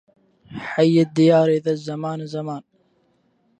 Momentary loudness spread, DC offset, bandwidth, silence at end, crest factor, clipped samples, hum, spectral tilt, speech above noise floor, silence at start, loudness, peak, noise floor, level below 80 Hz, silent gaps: 18 LU; under 0.1%; 9.4 kHz; 1 s; 18 dB; under 0.1%; none; -7.5 dB/octave; 45 dB; 0.5 s; -19 LUFS; -4 dBFS; -64 dBFS; -66 dBFS; none